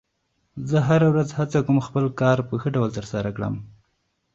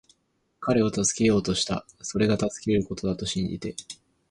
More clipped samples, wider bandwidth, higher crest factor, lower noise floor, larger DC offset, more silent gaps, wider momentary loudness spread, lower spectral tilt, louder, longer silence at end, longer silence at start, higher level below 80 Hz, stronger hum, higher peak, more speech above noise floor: neither; second, 7.8 kHz vs 11.5 kHz; about the same, 18 dB vs 16 dB; about the same, -72 dBFS vs -72 dBFS; neither; neither; about the same, 12 LU vs 13 LU; first, -8 dB/octave vs -4.5 dB/octave; first, -22 LUFS vs -26 LUFS; first, 0.7 s vs 0.35 s; about the same, 0.55 s vs 0.6 s; about the same, -52 dBFS vs -50 dBFS; neither; first, -4 dBFS vs -10 dBFS; first, 50 dB vs 46 dB